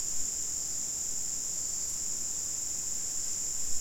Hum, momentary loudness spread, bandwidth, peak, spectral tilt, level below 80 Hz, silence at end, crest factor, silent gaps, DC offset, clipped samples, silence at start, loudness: none; 1 LU; 16.5 kHz; -18 dBFS; 0.5 dB/octave; -54 dBFS; 0 s; 16 dB; none; 0.8%; under 0.1%; 0 s; -31 LUFS